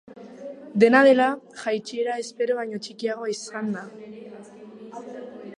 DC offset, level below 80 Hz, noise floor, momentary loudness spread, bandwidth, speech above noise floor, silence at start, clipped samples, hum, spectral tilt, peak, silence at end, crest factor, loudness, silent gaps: under 0.1%; -76 dBFS; -43 dBFS; 25 LU; 11 kHz; 21 dB; 0.1 s; under 0.1%; none; -5 dB/octave; -4 dBFS; 0.05 s; 22 dB; -23 LUFS; none